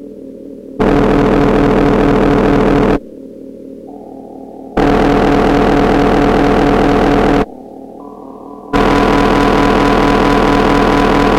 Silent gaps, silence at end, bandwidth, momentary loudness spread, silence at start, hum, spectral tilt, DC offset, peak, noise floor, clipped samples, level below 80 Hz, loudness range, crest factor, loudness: none; 0 s; 13.5 kHz; 21 LU; 0 s; none; -7 dB/octave; under 0.1%; 0 dBFS; -31 dBFS; under 0.1%; -24 dBFS; 3 LU; 10 dB; -11 LUFS